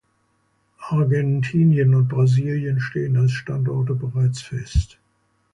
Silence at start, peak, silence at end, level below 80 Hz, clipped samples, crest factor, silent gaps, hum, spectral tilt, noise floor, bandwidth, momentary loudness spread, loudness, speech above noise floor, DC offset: 0.8 s; -8 dBFS; 0.65 s; -36 dBFS; under 0.1%; 12 dB; none; none; -8 dB/octave; -66 dBFS; 9.4 kHz; 8 LU; -20 LUFS; 47 dB; under 0.1%